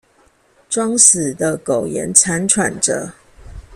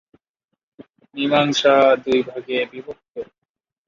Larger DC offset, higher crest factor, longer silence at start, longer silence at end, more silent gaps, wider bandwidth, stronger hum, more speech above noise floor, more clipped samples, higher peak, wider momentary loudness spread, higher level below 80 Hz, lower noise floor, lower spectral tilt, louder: neither; about the same, 18 dB vs 18 dB; about the same, 0.7 s vs 0.8 s; second, 0 s vs 0.65 s; second, none vs 3.10-3.14 s; first, 16 kHz vs 7.4 kHz; neither; second, 39 dB vs 63 dB; neither; about the same, 0 dBFS vs -2 dBFS; second, 12 LU vs 21 LU; first, -46 dBFS vs -62 dBFS; second, -55 dBFS vs -81 dBFS; second, -2.5 dB/octave vs -4.5 dB/octave; first, -14 LUFS vs -18 LUFS